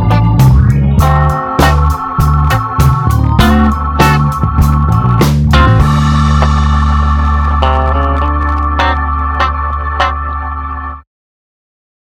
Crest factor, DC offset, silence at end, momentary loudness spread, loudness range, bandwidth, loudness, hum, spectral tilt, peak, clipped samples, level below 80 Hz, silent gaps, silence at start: 10 dB; under 0.1%; 1.2 s; 6 LU; 5 LU; 16.5 kHz; -11 LUFS; none; -6.5 dB/octave; 0 dBFS; 0.3%; -14 dBFS; none; 0 s